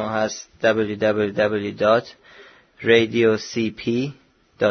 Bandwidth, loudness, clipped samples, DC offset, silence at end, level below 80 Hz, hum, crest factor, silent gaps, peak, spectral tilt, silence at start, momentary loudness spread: 6.6 kHz; -21 LUFS; under 0.1%; under 0.1%; 0 s; -58 dBFS; none; 18 dB; none; -4 dBFS; -5 dB/octave; 0 s; 8 LU